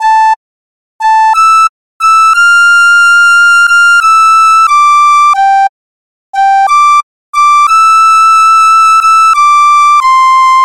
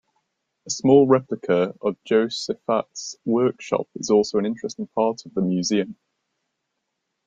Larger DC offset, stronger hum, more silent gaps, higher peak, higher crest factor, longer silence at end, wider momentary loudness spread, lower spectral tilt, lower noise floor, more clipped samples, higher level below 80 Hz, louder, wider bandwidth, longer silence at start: first, 2% vs under 0.1%; neither; first, 0.36-0.99 s, 1.69-2.00 s, 5.69-6.33 s, 7.03-7.33 s vs none; about the same, 0 dBFS vs -2 dBFS; second, 6 dB vs 20 dB; second, 0 s vs 1.35 s; second, 7 LU vs 11 LU; second, 5 dB/octave vs -5.5 dB/octave; first, under -90 dBFS vs -78 dBFS; neither; first, -52 dBFS vs -64 dBFS; first, -4 LUFS vs -22 LUFS; first, 15.5 kHz vs 7.8 kHz; second, 0 s vs 0.65 s